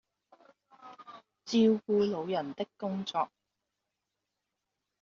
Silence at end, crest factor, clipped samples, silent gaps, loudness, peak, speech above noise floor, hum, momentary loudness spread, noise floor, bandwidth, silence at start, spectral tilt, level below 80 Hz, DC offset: 1.75 s; 18 dB; under 0.1%; none; -31 LUFS; -16 dBFS; 56 dB; none; 24 LU; -86 dBFS; 7.2 kHz; 0.85 s; -5 dB/octave; -76 dBFS; under 0.1%